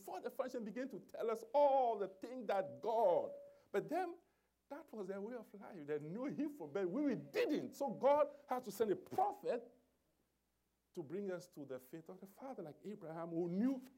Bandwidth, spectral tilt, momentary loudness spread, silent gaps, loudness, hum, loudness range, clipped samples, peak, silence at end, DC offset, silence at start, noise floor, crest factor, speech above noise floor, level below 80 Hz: 16 kHz; -6.5 dB/octave; 17 LU; none; -41 LUFS; none; 11 LU; under 0.1%; -24 dBFS; 0.1 s; under 0.1%; 0 s; -84 dBFS; 18 dB; 44 dB; -88 dBFS